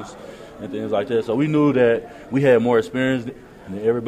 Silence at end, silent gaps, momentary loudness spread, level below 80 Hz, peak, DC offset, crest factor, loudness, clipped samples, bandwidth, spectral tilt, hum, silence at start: 0 s; none; 20 LU; -54 dBFS; -4 dBFS; under 0.1%; 16 dB; -20 LUFS; under 0.1%; 10 kHz; -7.5 dB/octave; none; 0 s